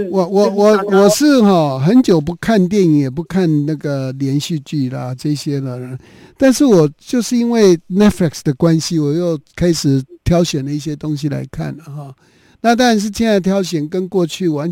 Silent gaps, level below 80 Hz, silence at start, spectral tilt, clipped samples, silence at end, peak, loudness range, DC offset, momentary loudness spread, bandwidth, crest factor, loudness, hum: none; -42 dBFS; 0 s; -6 dB/octave; under 0.1%; 0 s; 0 dBFS; 6 LU; under 0.1%; 11 LU; 17 kHz; 14 dB; -15 LUFS; none